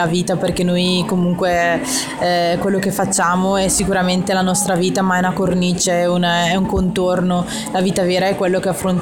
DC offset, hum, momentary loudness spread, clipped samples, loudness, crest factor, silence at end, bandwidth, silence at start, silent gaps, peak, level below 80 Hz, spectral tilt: 0.3%; none; 3 LU; under 0.1%; -16 LUFS; 12 dB; 0 s; 17 kHz; 0 s; none; -4 dBFS; -40 dBFS; -4.5 dB/octave